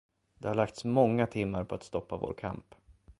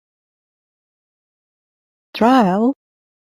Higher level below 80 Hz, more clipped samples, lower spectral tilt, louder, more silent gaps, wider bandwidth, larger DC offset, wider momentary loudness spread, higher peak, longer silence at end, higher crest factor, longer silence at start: first, -56 dBFS vs -62 dBFS; neither; about the same, -7.5 dB/octave vs -7 dB/octave; second, -32 LUFS vs -15 LUFS; neither; second, 11.5 kHz vs 14 kHz; neither; second, 13 LU vs 20 LU; second, -12 dBFS vs -2 dBFS; second, 0.1 s vs 0.55 s; about the same, 22 dB vs 18 dB; second, 0.4 s vs 2.15 s